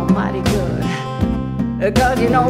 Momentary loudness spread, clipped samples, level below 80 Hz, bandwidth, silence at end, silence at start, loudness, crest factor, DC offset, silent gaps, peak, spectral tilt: 6 LU; under 0.1%; -30 dBFS; 16 kHz; 0 s; 0 s; -18 LUFS; 14 dB; under 0.1%; none; -2 dBFS; -6.5 dB/octave